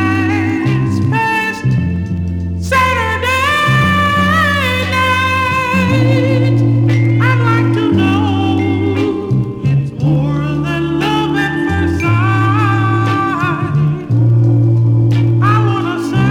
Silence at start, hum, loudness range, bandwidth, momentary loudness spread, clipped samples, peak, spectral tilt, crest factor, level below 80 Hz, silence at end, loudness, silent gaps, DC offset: 0 s; none; 3 LU; 13.5 kHz; 5 LU; under 0.1%; 0 dBFS; -7 dB/octave; 12 dB; -40 dBFS; 0 s; -13 LUFS; none; under 0.1%